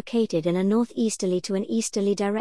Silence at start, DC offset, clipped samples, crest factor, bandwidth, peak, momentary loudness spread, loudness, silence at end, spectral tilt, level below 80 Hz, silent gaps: 0.05 s; 0.2%; under 0.1%; 12 dB; 12 kHz; -12 dBFS; 3 LU; -24 LUFS; 0 s; -5.5 dB/octave; -64 dBFS; none